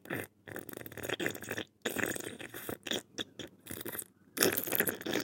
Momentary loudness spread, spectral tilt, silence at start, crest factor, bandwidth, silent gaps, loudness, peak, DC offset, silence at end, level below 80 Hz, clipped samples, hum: 15 LU; -2.5 dB/octave; 0.05 s; 32 dB; 17 kHz; none; -36 LUFS; -6 dBFS; under 0.1%; 0 s; -74 dBFS; under 0.1%; none